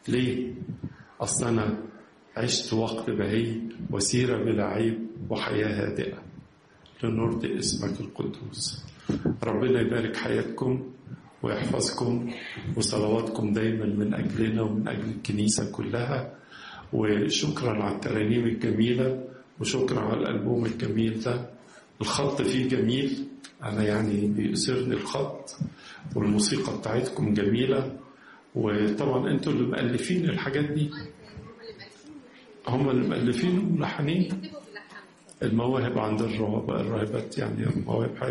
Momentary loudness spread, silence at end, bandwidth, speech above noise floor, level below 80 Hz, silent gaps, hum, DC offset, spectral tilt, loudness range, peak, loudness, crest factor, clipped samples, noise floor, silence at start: 14 LU; 0 s; 11.5 kHz; 29 dB; -56 dBFS; none; none; under 0.1%; -5.5 dB/octave; 2 LU; -12 dBFS; -28 LUFS; 16 dB; under 0.1%; -56 dBFS; 0.05 s